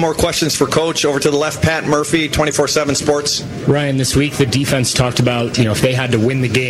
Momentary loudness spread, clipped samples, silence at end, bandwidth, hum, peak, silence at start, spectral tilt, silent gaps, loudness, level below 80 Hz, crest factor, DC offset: 2 LU; under 0.1%; 0 s; 16 kHz; none; -4 dBFS; 0 s; -4.5 dB/octave; none; -15 LUFS; -36 dBFS; 12 dB; under 0.1%